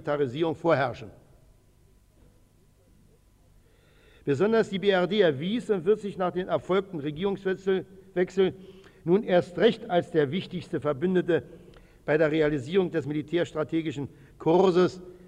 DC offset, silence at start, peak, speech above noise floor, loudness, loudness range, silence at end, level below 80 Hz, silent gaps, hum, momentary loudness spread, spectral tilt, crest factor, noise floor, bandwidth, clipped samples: under 0.1%; 0.05 s; -10 dBFS; 34 dB; -26 LUFS; 6 LU; 0.15 s; -60 dBFS; none; none; 10 LU; -7 dB/octave; 18 dB; -60 dBFS; 10 kHz; under 0.1%